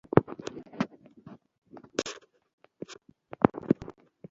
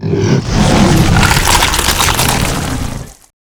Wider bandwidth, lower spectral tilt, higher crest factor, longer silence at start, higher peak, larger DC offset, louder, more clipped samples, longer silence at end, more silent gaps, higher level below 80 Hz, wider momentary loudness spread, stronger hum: second, 7.6 kHz vs over 20 kHz; first, -6.5 dB/octave vs -4 dB/octave; first, 32 dB vs 12 dB; first, 0.15 s vs 0 s; about the same, 0 dBFS vs 0 dBFS; neither; second, -31 LUFS vs -11 LUFS; second, under 0.1% vs 0.1%; about the same, 0.4 s vs 0.35 s; first, 1.58-1.62 s, 2.53-2.58 s vs none; second, -60 dBFS vs -20 dBFS; first, 26 LU vs 10 LU; neither